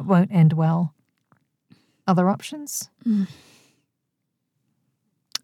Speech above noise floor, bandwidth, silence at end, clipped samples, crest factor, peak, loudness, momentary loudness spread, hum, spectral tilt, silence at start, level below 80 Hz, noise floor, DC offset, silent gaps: 58 dB; 14.5 kHz; 2.1 s; under 0.1%; 20 dB; -6 dBFS; -22 LUFS; 13 LU; none; -6.5 dB/octave; 0 s; -78 dBFS; -78 dBFS; under 0.1%; none